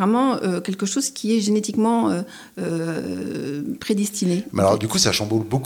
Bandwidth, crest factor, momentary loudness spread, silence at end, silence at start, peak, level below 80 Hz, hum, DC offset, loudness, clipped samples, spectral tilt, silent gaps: 20 kHz; 18 dB; 9 LU; 0 s; 0 s; -2 dBFS; -58 dBFS; none; under 0.1%; -22 LUFS; under 0.1%; -4.5 dB/octave; none